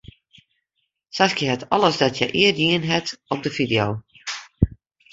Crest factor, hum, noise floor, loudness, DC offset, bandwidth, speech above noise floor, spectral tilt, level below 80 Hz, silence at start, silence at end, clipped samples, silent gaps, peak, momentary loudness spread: 22 dB; none; -75 dBFS; -21 LUFS; under 0.1%; 8 kHz; 55 dB; -4.5 dB/octave; -40 dBFS; 1.15 s; 0.45 s; under 0.1%; none; -2 dBFS; 14 LU